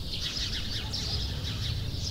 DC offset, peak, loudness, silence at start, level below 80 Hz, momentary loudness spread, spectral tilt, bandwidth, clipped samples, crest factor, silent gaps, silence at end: under 0.1%; -20 dBFS; -32 LUFS; 0 s; -40 dBFS; 2 LU; -3.5 dB/octave; 16 kHz; under 0.1%; 12 dB; none; 0 s